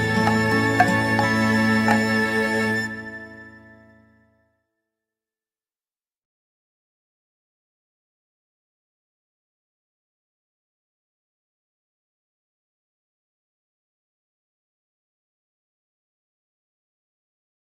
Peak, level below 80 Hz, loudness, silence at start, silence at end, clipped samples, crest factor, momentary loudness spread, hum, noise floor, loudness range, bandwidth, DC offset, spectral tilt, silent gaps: -2 dBFS; -60 dBFS; -20 LUFS; 0 s; 14.15 s; under 0.1%; 24 dB; 15 LU; none; under -90 dBFS; 14 LU; 15.5 kHz; under 0.1%; -5.5 dB/octave; none